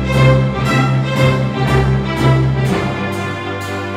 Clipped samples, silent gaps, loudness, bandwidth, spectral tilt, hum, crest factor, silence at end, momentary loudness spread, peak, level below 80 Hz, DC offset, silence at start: under 0.1%; none; -15 LUFS; 12.5 kHz; -7 dB/octave; none; 14 dB; 0 s; 9 LU; 0 dBFS; -28 dBFS; under 0.1%; 0 s